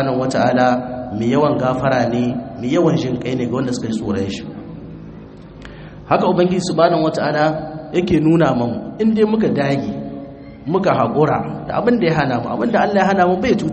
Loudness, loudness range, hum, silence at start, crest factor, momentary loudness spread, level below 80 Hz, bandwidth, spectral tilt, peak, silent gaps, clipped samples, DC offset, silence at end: -17 LUFS; 5 LU; none; 0 s; 16 dB; 18 LU; -46 dBFS; 8.8 kHz; -7 dB/octave; 0 dBFS; none; under 0.1%; under 0.1%; 0 s